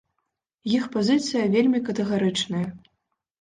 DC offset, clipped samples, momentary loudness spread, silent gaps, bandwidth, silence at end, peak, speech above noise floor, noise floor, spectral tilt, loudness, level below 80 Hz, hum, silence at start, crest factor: under 0.1%; under 0.1%; 8 LU; none; 9.8 kHz; 0.65 s; -8 dBFS; 56 dB; -79 dBFS; -5.5 dB/octave; -23 LUFS; -62 dBFS; none; 0.65 s; 16 dB